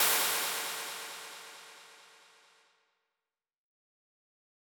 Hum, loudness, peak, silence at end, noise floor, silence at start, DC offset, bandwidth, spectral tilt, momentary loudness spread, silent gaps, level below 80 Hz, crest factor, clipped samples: none; -32 LUFS; -14 dBFS; 2.55 s; under -90 dBFS; 0 s; under 0.1%; 19 kHz; 1.5 dB/octave; 24 LU; none; under -90 dBFS; 24 dB; under 0.1%